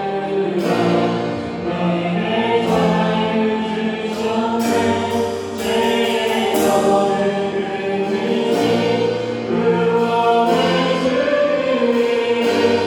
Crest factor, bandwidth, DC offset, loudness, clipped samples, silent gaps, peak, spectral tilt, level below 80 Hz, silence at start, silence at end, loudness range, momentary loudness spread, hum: 14 dB; 18 kHz; under 0.1%; -18 LUFS; under 0.1%; none; -4 dBFS; -5.5 dB/octave; -54 dBFS; 0 s; 0 s; 2 LU; 6 LU; none